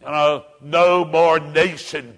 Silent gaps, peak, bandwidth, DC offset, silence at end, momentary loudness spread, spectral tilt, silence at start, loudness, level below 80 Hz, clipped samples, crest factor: none; -4 dBFS; 10.5 kHz; under 0.1%; 0.05 s; 8 LU; -4.5 dB/octave; 0.05 s; -17 LUFS; -58 dBFS; under 0.1%; 14 dB